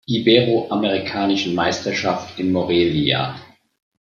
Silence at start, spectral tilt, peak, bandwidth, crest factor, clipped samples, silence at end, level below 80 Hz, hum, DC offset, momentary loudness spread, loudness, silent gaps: 0.1 s; -5.5 dB/octave; 0 dBFS; 7.4 kHz; 20 dB; under 0.1%; 0.7 s; -54 dBFS; none; under 0.1%; 8 LU; -19 LUFS; none